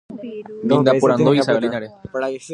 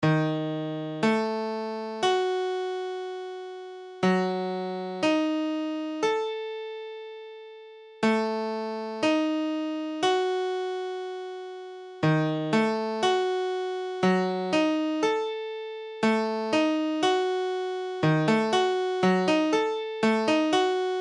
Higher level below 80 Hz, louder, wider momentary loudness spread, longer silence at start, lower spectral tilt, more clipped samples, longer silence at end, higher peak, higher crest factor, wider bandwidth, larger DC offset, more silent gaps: first, -58 dBFS vs -70 dBFS; first, -17 LUFS vs -27 LUFS; first, 17 LU vs 13 LU; about the same, 0.1 s vs 0 s; about the same, -6.5 dB/octave vs -5.5 dB/octave; neither; about the same, 0 s vs 0 s; first, 0 dBFS vs -12 dBFS; about the same, 18 dB vs 16 dB; about the same, 11.5 kHz vs 11 kHz; neither; neither